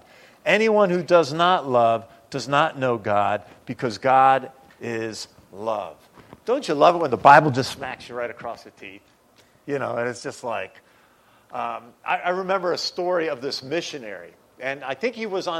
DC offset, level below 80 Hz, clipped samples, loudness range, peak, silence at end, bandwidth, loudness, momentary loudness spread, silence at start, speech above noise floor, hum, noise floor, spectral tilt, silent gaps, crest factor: under 0.1%; -66 dBFS; under 0.1%; 11 LU; 0 dBFS; 0 s; 14.5 kHz; -22 LUFS; 19 LU; 0.45 s; 35 dB; none; -57 dBFS; -5 dB/octave; none; 22 dB